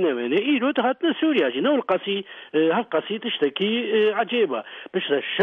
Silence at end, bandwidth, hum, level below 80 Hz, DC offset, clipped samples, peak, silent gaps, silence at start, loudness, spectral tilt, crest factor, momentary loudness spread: 0 s; 4.3 kHz; none; -76 dBFS; under 0.1%; under 0.1%; -8 dBFS; none; 0 s; -23 LUFS; -7.5 dB/octave; 14 dB; 6 LU